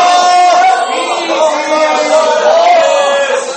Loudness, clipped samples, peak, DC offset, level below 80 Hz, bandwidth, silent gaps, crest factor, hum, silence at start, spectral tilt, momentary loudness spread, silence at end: -9 LUFS; under 0.1%; 0 dBFS; under 0.1%; -68 dBFS; 8.8 kHz; none; 10 dB; none; 0 s; -0.5 dB/octave; 5 LU; 0 s